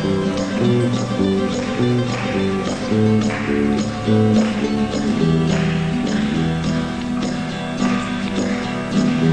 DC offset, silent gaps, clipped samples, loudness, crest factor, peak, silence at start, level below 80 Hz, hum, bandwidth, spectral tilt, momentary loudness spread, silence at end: 0.2%; none; under 0.1%; -19 LUFS; 14 dB; -4 dBFS; 0 s; -40 dBFS; none; 10 kHz; -6.5 dB/octave; 5 LU; 0 s